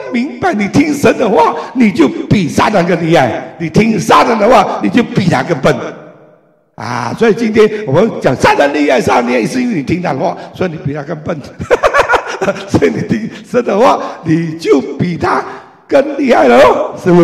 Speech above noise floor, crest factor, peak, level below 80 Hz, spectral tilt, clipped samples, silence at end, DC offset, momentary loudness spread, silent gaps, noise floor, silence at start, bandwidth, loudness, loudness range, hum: 37 dB; 12 dB; 0 dBFS; -40 dBFS; -6 dB/octave; under 0.1%; 0 s; 0.2%; 10 LU; none; -47 dBFS; 0 s; 15 kHz; -11 LUFS; 4 LU; none